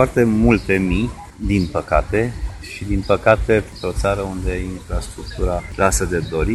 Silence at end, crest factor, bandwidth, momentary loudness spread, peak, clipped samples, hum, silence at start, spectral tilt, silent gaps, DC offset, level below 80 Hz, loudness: 0 s; 18 dB; 13 kHz; 12 LU; 0 dBFS; under 0.1%; none; 0 s; -6 dB/octave; none; under 0.1%; -28 dBFS; -19 LUFS